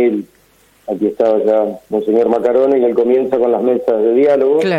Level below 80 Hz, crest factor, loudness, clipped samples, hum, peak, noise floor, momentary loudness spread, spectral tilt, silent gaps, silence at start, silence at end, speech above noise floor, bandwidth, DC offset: -58 dBFS; 12 dB; -14 LUFS; under 0.1%; none; -2 dBFS; -38 dBFS; 7 LU; -7.5 dB/octave; none; 0 s; 0 s; 25 dB; 9.4 kHz; under 0.1%